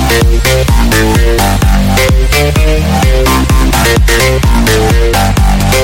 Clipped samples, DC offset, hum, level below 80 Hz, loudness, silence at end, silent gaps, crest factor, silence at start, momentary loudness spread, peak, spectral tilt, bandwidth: under 0.1%; under 0.1%; none; -10 dBFS; -9 LUFS; 0 s; none; 8 dB; 0 s; 1 LU; 0 dBFS; -4.5 dB/octave; 17 kHz